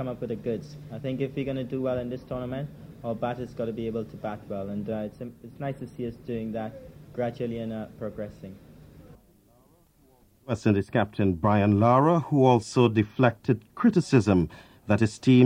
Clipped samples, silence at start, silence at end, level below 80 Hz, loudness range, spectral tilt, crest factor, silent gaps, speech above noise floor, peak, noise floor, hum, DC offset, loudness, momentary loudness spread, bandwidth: under 0.1%; 0 s; 0 s; -54 dBFS; 13 LU; -7.5 dB/octave; 20 dB; none; 35 dB; -6 dBFS; -60 dBFS; none; under 0.1%; -27 LUFS; 17 LU; 10.5 kHz